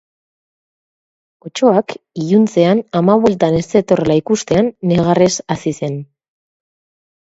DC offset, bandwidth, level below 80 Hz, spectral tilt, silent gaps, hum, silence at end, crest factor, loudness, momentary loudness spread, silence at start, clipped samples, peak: under 0.1%; 8 kHz; -50 dBFS; -6 dB/octave; none; none; 1.25 s; 16 dB; -14 LUFS; 11 LU; 1.45 s; under 0.1%; 0 dBFS